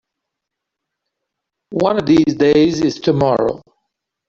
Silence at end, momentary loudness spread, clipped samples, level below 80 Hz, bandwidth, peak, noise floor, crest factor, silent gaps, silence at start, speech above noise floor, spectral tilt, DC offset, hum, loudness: 0.7 s; 9 LU; under 0.1%; -50 dBFS; 7.4 kHz; -2 dBFS; -80 dBFS; 14 dB; none; 1.7 s; 66 dB; -6.5 dB/octave; under 0.1%; none; -15 LUFS